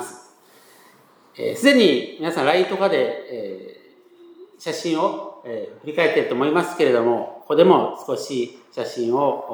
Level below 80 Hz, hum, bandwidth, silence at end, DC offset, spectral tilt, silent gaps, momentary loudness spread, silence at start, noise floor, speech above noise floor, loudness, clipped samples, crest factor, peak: -82 dBFS; none; over 20 kHz; 0 s; under 0.1%; -5 dB/octave; none; 16 LU; 0 s; -53 dBFS; 33 dB; -20 LUFS; under 0.1%; 20 dB; 0 dBFS